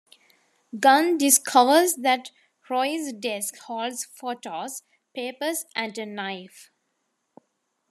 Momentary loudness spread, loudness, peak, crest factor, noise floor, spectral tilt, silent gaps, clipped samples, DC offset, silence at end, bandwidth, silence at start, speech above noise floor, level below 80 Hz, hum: 16 LU; -23 LUFS; -2 dBFS; 22 dB; -75 dBFS; -1.5 dB/octave; none; under 0.1%; under 0.1%; 1.3 s; 14 kHz; 0.75 s; 52 dB; -86 dBFS; none